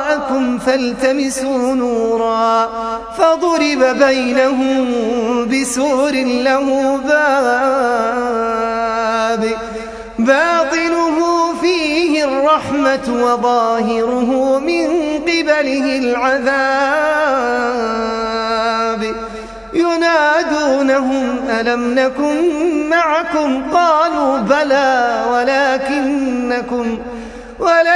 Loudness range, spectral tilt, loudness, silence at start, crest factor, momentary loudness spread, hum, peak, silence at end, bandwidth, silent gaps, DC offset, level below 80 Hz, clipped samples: 2 LU; -3.5 dB/octave; -15 LUFS; 0 s; 14 dB; 6 LU; none; 0 dBFS; 0 s; 11 kHz; none; under 0.1%; -46 dBFS; under 0.1%